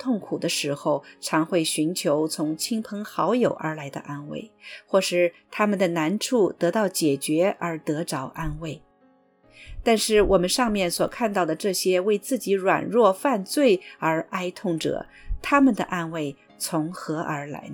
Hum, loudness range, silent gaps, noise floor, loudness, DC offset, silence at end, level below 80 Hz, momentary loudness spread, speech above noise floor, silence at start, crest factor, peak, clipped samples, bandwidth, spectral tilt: none; 4 LU; none; -60 dBFS; -24 LUFS; under 0.1%; 0 s; -46 dBFS; 13 LU; 36 dB; 0 s; 18 dB; -6 dBFS; under 0.1%; 19 kHz; -4.5 dB/octave